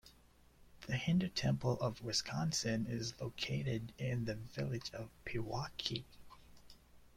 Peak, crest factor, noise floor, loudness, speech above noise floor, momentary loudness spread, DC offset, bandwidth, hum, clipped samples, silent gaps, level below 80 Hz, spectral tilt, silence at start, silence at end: -18 dBFS; 22 dB; -66 dBFS; -39 LUFS; 27 dB; 9 LU; under 0.1%; 16 kHz; none; under 0.1%; none; -62 dBFS; -5 dB/octave; 0.05 s; 0.1 s